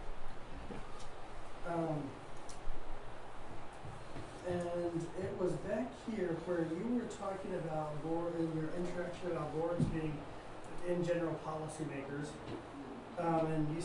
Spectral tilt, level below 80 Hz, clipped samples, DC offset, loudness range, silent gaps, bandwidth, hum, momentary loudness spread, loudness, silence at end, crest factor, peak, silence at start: -7 dB/octave; -52 dBFS; under 0.1%; under 0.1%; 6 LU; none; 11 kHz; none; 14 LU; -40 LUFS; 0 s; 16 dB; -22 dBFS; 0 s